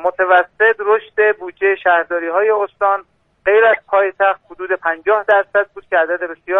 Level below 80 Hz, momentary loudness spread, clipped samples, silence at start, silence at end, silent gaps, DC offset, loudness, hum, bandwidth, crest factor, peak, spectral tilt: -60 dBFS; 7 LU; under 0.1%; 0 s; 0 s; none; under 0.1%; -15 LUFS; none; 4 kHz; 14 dB; -2 dBFS; -5 dB/octave